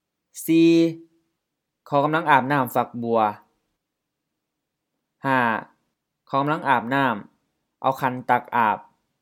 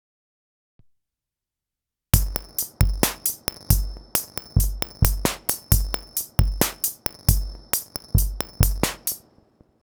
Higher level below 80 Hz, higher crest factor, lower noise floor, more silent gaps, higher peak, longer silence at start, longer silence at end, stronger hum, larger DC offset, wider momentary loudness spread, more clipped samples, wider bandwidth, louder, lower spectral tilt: second, -76 dBFS vs -28 dBFS; about the same, 24 dB vs 24 dB; second, -81 dBFS vs -87 dBFS; neither; about the same, 0 dBFS vs 0 dBFS; second, 0.35 s vs 2.15 s; second, 0.4 s vs 0.65 s; neither; neither; first, 12 LU vs 5 LU; neither; second, 17 kHz vs over 20 kHz; about the same, -22 LUFS vs -24 LUFS; first, -6 dB/octave vs -4 dB/octave